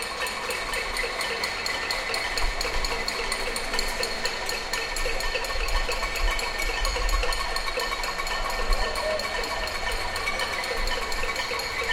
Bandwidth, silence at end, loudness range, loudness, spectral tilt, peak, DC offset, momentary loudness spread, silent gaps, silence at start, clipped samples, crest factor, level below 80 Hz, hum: 17 kHz; 0 s; 0 LU; -27 LUFS; -1.5 dB/octave; -10 dBFS; under 0.1%; 2 LU; none; 0 s; under 0.1%; 18 dB; -32 dBFS; none